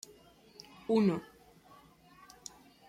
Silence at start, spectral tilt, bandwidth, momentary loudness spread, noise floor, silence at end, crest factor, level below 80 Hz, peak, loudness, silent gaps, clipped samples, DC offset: 0.9 s; -6.5 dB/octave; 15 kHz; 27 LU; -60 dBFS; 1.65 s; 20 dB; -72 dBFS; -18 dBFS; -31 LUFS; none; under 0.1%; under 0.1%